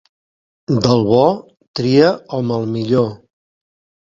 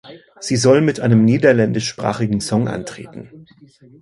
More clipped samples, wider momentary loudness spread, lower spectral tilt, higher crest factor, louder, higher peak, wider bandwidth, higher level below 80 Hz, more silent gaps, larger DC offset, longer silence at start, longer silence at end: neither; second, 11 LU vs 19 LU; about the same, -7 dB/octave vs -6 dB/octave; about the same, 18 dB vs 18 dB; about the same, -16 LUFS vs -16 LUFS; about the same, 0 dBFS vs 0 dBFS; second, 7.6 kHz vs 11.5 kHz; about the same, -52 dBFS vs -50 dBFS; first, 1.67-1.74 s vs none; neither; first, 0.7 s vs 0.05 s; first, 0.9 s vs 0.6 s